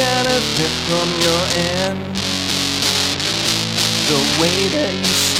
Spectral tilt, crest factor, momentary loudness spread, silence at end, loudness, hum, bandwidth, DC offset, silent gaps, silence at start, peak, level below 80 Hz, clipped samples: -2.5 dB/octave; 16 dB; 4 LU; 0 s; -16 LUFS; none; 16.5 kHz; under 0.1%; none; 0 s; 0 dBFS; -42 dBFS; under 0.1%